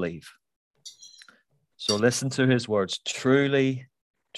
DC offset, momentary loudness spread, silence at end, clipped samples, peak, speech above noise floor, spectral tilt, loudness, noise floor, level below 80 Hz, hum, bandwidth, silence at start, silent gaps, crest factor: under 0.1%; 22 LU; 0 s; under 0.1%; -8 dBFS; 40 dB; -4.5 dB/octave; -24 LUFS; -64 dBFS; -64 dBFS; none; 13 kHz; 0 s; 0.56-0.71 s, 4.01-4.14 s; 20 dB